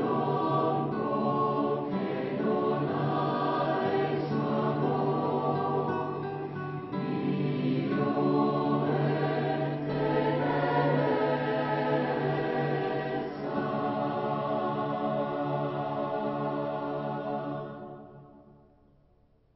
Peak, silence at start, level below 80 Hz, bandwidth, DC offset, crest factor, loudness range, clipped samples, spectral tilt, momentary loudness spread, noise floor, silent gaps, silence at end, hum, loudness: -14 dBFS; 0 s; -64 dBFS; 5.8 kHz; under 0.1%; 14 dB; 4 LU; under 0.1%; -6 dB/octave; 6 LU; -64 dBFS; none; 1.15 s; none; -29 LUFS